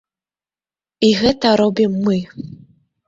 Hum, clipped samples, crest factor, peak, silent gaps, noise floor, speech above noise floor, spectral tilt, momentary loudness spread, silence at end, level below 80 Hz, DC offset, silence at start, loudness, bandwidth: none; under 0.1%; 16 dB; -2 dBFS; none; under -90 dBFS; over 74 dB; -6 dB/octave; 18 LU; 0.6 s; -50 dBFS; under 0.1%; 1 s; -16 LUFS; 7.8 kHz